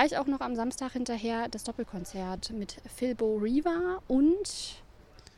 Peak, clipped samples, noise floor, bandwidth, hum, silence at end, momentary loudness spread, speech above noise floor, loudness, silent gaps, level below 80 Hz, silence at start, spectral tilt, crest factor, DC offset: -10 dBFS; under 0.1%; -54 dBFS; 15 kHz; none; 0.35 s; 12 LU; 24 dB; -31 LUFS; none; -52 dBFS; 0 s; -4.5 dB/octave; 20 dB; under 0.1%